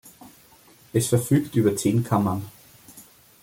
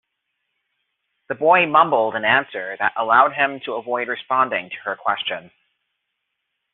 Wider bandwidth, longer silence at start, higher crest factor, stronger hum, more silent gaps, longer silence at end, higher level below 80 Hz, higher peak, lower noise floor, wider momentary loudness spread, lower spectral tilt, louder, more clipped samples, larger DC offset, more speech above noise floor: first, 17 kHz vs 4.2 kHz; second, 0.05 s vs 1.3 s; about the same, 20 dB vs 20 dB; neither; neither; second, 0.4 s vs 1.25 s; first, -58 dBFS vs -68 dBFS; second, -6 dBFS vs -2 dBFS; second, -53 dBFS vs -77 dBFS; second, 8 LU vs 13 LU; first, -6.5 dB/octave vs -1 dB/octave; second, -23 LUFS vs -19 LUFS; neither; neither; second, 32 dB vs 57 dB